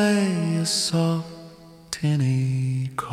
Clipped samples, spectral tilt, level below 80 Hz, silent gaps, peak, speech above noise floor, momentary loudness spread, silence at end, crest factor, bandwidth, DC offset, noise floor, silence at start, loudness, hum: under 0.1%; -5 dB/octave; -60 dBFS; none; -6 dBFS; 23 dB; 11 LU; 0 s; 16 dB; 15.5 kHz; under 0.1%; -45 dBFS; 0 s; -23 LUFS; none